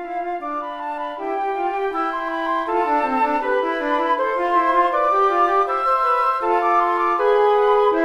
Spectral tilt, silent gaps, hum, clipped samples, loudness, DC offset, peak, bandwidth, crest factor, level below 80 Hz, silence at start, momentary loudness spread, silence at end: -4 dB/octave; none; none; under 0.1%; -19 LUFS; under 0.1%; -6 dBFS; 12.5 kHz; 14 dB; -52 dBFS; 0 s; 10 LU; 0 s